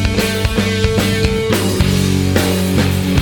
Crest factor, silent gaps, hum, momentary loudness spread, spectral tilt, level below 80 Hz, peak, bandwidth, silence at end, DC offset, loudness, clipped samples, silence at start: 14 dB; none; none; 1 LU; -5 dB/octave; -26 dBFS; -2 dBFS; 19.5 kHz; 0 s; under 0.1%; -15 LUFS; under 0.1%; 0 s